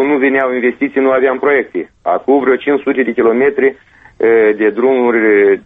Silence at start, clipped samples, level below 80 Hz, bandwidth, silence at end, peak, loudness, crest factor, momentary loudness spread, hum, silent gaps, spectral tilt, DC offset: 0 s; under 0.1%; -54 dBFS; 3.9 kHz; 0.05 s; 0 dBFS; -12 LUFS; 12 dB; 6 LU; none; none; -8 dB/octave; under 0.1%